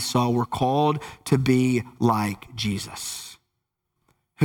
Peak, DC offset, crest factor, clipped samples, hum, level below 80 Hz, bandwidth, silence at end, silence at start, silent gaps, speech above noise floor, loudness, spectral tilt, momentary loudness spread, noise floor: -6 dBFS; under 0.1%; 18 dB; under 0.1%; none; -54 dBFS; 18 kHz; 0 s; 0 s; none; 56 dB; -24 LUFS; -5.5 dB/octave; 11 LU; -79 dBFS